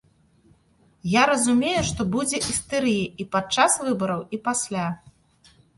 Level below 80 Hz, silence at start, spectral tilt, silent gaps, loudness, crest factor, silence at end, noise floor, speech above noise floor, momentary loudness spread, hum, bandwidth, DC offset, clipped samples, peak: -50 dBFS; 1.05 s; -3.5 dB/octave; none; -23 LUFS; 22 dB; 0.8 s; -60 dBFS; 38 dB; 8 LU; none; 11.5 kHz; under 0.1%; under 0.1%; -4 dBFS